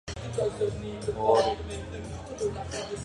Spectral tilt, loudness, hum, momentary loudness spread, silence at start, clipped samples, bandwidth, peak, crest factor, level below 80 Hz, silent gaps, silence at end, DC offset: -5 dB/octave; -30 LUFS; none; 14 LU; 0.05 s; under 0.1%; 11.5 kHz; -8 dBFS; 22 dB; -46 dBFS; none; 0 s; under 0.1%